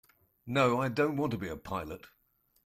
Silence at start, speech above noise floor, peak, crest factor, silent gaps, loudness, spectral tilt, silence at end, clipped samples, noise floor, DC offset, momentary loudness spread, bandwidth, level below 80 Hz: 0.45 s; 42 dB; -14 dBFS; 18 dB; none; -31 LUFS; -6.5 dB/octave; 0.6 s; under 0.1%; -73 dBFS; under 0.1%; 12 LU; 15.5 kHz; -62 dBFS